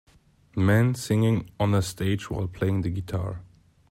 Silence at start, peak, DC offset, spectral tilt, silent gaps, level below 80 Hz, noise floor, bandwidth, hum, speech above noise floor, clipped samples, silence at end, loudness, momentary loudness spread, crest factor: 0.55 s; -10 dBFS; under 0.1%; -6.5 dB/octave; none; -50 dBFS; -56 dBFS; 16 kHz; none; 32 dB; under 0.1%; 0.45 s; -26 LUFS; 10 LU; 14 dB